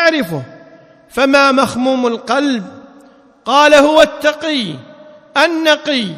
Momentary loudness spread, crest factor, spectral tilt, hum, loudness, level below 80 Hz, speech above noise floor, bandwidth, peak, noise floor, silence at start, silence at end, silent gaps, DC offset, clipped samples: 17 LU; 14 dB; -3.5 dB/octave; none; -12 LUFS; -52 dBFS; 32 dB; 15.5 kHz; 0 dBFS; -44 dBFS; 0 s; 0 s; none; under 0.1%; 0.4%